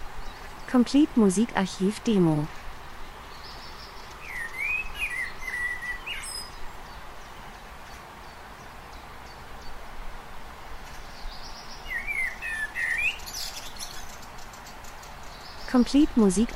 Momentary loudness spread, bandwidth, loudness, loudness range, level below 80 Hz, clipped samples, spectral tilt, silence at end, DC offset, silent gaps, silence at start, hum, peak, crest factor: 21 LU; 16 kHz; -26 LUFS; 18 LU; -44 dBFS; under 0.1%; -5 dB/octave; 0 s; under 0.1%; none; 0 s; none; -8 dBFS; 20 dB